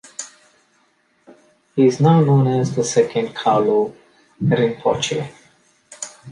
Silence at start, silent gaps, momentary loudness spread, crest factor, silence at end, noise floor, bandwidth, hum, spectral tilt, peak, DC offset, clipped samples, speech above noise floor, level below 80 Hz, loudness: 0.2 s; none; 19 LU; 16 dB; 0 s; -61 dBFS; 11 kHz; none; -6 dB/octave; -2 dBFS; under 0.1%; under 0.1%; 45 dB; -58 dBFS; -18 LUFS